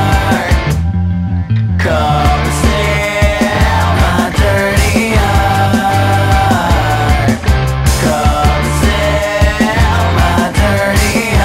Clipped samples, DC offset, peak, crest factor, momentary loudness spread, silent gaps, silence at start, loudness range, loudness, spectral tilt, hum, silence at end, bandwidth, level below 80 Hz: under 0.1%; 0.4%; 0 dBFS; 10 dB; 2 LU; none; 0 s; 1 LU; -12 LUFS; -5.5 dB/octave; none; 0 s; 16.5 kHz; -16 dBFS